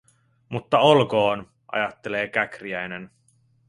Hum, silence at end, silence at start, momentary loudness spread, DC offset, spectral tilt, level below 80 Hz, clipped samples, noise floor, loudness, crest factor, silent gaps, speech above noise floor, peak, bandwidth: none; 0.6 s; 0.5 s; 17 LU; under 0.1%; -6 dB/octave; -62 dBFS; under 0.1%; -62 dBFS; -23 LUFS; 22 dB; none; 40 dB; -2 dBFS; 11.5 kHz